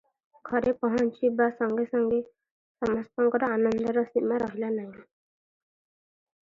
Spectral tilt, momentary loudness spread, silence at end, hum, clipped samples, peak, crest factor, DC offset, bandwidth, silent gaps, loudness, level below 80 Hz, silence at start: -7.5 dB/octave; 7 LU; 1.45 s; none; under 0.1%; -10 dBFS; 18 dB; under 0.1%; 7.4 kHz; 2.51-2.75 s; -27 LUFS; -62 dBFS; 0.45 s